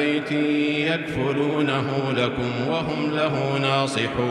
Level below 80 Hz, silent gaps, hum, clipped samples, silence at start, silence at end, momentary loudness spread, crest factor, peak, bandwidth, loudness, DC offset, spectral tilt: -52 dBFS; none; none; under 0.1%; 0 s; 0 s; 3 LU; 14 dB; -10 dBFS; 11.5 kHz; -23 LUFS; under 0.1%; -6 dB/octave